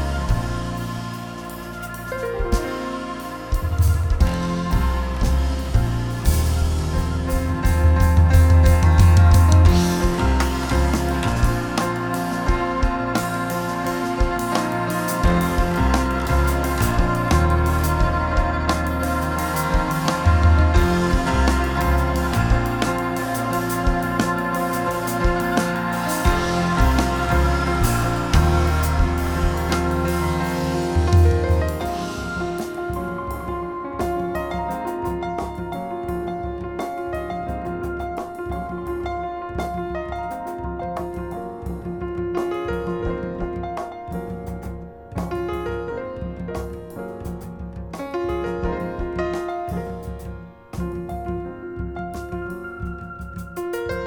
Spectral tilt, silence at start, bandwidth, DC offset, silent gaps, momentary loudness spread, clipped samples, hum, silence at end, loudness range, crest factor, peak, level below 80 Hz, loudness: -6 dB/octave; 0 s; over 20 kHz; under 0.1%; none; 14 LU; under 0.1%; none; 0 s; 12 LU; 18 dB; -2 dBFS; -26 dBFS; -22 LUFS